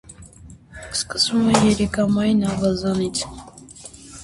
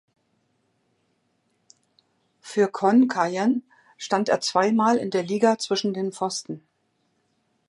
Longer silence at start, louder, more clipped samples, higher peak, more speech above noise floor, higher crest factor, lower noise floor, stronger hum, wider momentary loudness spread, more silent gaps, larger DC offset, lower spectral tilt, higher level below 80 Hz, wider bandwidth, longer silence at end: second, 0.1 s vs 2.45 s; first, -20 LUFS vs -23 LUFS; neither; first, 0 dBFS vs -6 dBFS; second, 24 dB vs 49 dB; about the same, 20 dB vs 20 dB; second, -44 dBFS vs -71 dBFS; neither; first, 23 LU vs 11 LU; neither; neither; about the same, -4.5 dB/octave vs -4.5 dB/octave; first, -44 dBFS vs -78 dBFS; about the same, 11.5 kHz vs 11.5 kHz; second, 0 s vs 1.1 s